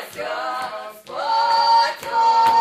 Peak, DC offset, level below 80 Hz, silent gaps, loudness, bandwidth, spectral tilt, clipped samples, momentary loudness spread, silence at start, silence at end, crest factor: -6 dBFS; under 0.1%; -64 dBFS; none; -19 LUFS; 15.5 kHz; -1.5 dB/octave; under 0.1%; 14 LU; 0 s; 0 s; 14 dB